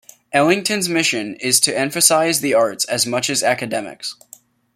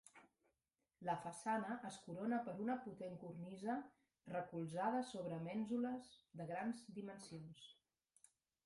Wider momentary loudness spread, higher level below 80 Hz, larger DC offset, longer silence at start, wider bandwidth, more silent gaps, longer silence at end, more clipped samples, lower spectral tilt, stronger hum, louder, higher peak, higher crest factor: about the same, 11 LU vs 13 LU; first, -64 dBFS vs -84 dBFS; neither; first, 0.35 s vs 0.05 s; first, 16.5 kHz vs 11.5 kHz; neither; second, 0.65 s vs 0.95 s; neither; second, -2 dB/octave vs -6 dB/octave; neither; first, -17 LUFS vs -46 LUFS; first, 0 dBFS vs -28 dBFS; about the same, 18 dB vs 20 dB